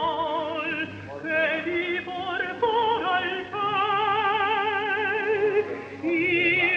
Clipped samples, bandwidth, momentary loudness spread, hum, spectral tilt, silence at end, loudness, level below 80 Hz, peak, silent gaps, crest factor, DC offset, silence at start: under 0.1%; 7.8 kHz; 6 LU; none; -5.5 dB/octave; 0 s; -25 LUFS; -64 dBFS; -12 dBFS; none; 14 dB; under 0.1%; 0 s